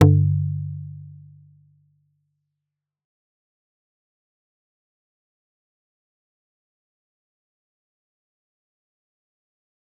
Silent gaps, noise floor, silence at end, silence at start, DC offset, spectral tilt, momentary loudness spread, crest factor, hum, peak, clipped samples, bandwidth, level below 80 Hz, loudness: none; -85 dBFS; 8.85 s; 0 s; under 0.1%; -9.5 dB/octave; 24 LU; 28 dB; none; -2 dBFS; under 0.1%; 4 kHz; -62 dBFS; -22 LUFS